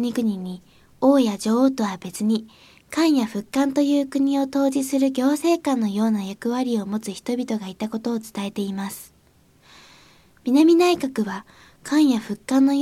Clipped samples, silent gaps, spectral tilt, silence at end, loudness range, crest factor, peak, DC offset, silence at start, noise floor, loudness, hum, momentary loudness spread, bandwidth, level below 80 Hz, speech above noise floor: under 0.1%; none; -5.5 dB/octave; 0 s; 7 LU; 16 dB; -6 dBFS; under 0.1%; 0 s; -57 dBFS; -22 LUFS; none; 11 LU; 15 kHz; -64 dBFS; 36 dB